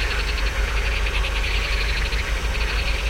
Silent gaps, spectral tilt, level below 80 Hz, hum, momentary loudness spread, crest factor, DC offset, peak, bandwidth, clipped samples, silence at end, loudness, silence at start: none; -3.5 dB/octave; -24 dBFS; none; 2 LU; 12 dB; under 0.1%; -10 dBFS; 15.5 kHz; under 0.1%; 0 s; -23 LUFS; 0 s